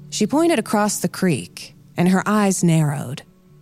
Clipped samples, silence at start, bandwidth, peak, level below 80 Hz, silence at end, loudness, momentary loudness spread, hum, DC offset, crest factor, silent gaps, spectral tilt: under 0.1%; 0 s; 16 kHz; -6 dBFS; -60 dBFS; 0.4 s; -19 LUFS; 15 LU; none; under 0.1%; 14 dB; none; -5.5 dB/octave